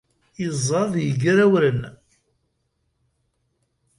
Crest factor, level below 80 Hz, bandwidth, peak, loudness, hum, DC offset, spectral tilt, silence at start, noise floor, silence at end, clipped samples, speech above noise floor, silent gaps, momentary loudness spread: 16 dB; -56 dBFS; 11.5 kHz; -6 dBFS; -20 LUFS; none; under 0.1%; -6 dB/octave; 0.4 s; -72 dBFS; 2.05 s; under 0.1%; 52 dB; none; 13 LU